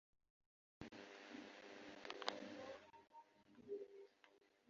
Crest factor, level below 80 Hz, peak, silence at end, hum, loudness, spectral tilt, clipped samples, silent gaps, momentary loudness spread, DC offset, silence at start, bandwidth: 36 dB; -86 dBFS; -20 dBFS; 0 s; none; -55 LUFS; -1.5 dB/octave; under 0.1%; none; 17 LU; under 0.1%; 0.8 s; 7.4 kHz